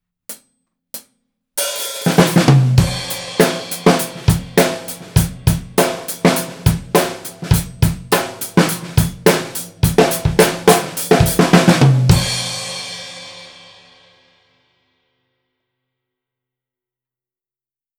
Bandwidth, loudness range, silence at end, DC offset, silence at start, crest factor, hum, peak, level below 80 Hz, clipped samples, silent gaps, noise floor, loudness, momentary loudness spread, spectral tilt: over 20 kHz; 4 LU; 4.5 s; under 0.1%; 0.3 s; 16 dB; none; 0 dBFS; -32 dBFS; under 0.1%; none; under -90 dBFS; -15 LUFS; 17 LU; -5 dB/octave